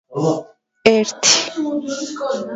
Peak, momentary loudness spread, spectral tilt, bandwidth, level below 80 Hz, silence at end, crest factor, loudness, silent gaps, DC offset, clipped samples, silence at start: 0 dBFS; 11 LU; -2.5 dB/octave; 8 kHz; -58 dBFS; 0 s; 18 dB; -17 LUFS; none; under 0.1%; under 0.1%; 0.1 s